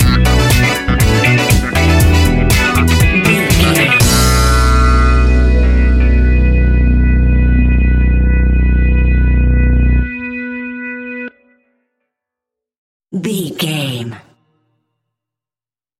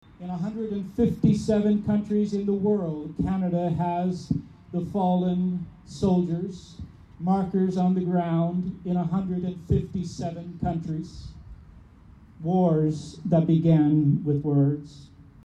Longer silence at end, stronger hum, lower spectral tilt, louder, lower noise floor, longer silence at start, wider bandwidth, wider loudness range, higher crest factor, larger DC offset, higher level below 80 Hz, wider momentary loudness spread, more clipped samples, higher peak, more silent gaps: first, 1.8 s vs 0.2 s; neither; second, -5 dB/octave vs -9 dB/octave; first, -12 LUFS vs -25 LUFS; first, under -90 dBFS vs -50 dBFS; second, 0 s vs 0.2 s; first, 16 kHz vs 9 kHz; first, 13 LU vs 6 LU; about the same, 12 dB vs 14 dB; neither; first, -14 dBFS vs -48 dBFS; about the same, 12 LU vs 12 LU; neither; first, 0 dBFS vs -10 dBFS; first, 12.78-13.00 s vs none